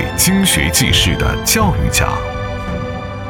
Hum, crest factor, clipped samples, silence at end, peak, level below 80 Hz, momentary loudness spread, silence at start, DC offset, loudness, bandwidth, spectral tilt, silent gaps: none; 16 dB; under 0.1%; 0 s; 0 dBFS; -24 dBFS; 11 LU; 0 s; under 0.1%; -14 LUFS; 18 kHz; -3.5 dB/octave; none